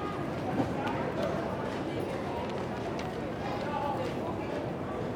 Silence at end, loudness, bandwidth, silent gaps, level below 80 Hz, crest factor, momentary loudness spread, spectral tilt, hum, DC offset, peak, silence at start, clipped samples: 0 s; -34 LUFS; 19.5 kHz; none; -54 dBFS; 18 dB; 3 LU; -7 dB/octave; none; under 0.1%; -16 dBFS; 0 s; under 0.1%